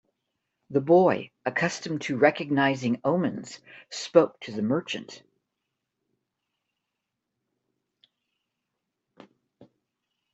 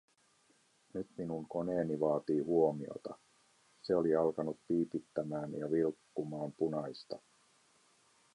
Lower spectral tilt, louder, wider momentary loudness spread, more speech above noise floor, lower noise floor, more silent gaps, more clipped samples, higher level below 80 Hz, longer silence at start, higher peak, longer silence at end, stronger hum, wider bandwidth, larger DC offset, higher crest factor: second, -5.5 dB/octave vs -8 dB/octave; first, -25 LUFS vs -36 LUFS; about the same, 17 LU vs 15 LU; first, 59 dB vs 36 dB; first, -84 dBFS vs -71 dBFS; neither; neither; about the same, -72 dBFS vs -72 dBFS; second, 0.7 s vs 0.95 s; first, -4 dBFS vs -18 dBFS; first, 5.15 s vs 1.15 s; neither; second, 8.2 kHz vs 11 kHz; neither; about the same, 24 dB vs 20 dB